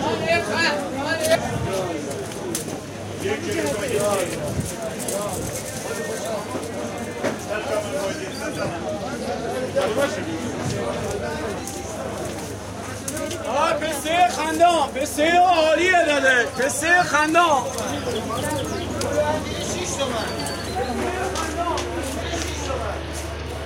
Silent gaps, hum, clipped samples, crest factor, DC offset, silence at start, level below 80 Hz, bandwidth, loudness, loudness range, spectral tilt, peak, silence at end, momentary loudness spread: none; none; under 0.1%; 18 dB; under 0.1%; 0 s; -44 dBFS; 16.5 kHz; -23 LUFS; 9 LU; -3.5 dB/octave; -4 dBFS; 0 s; 12 LU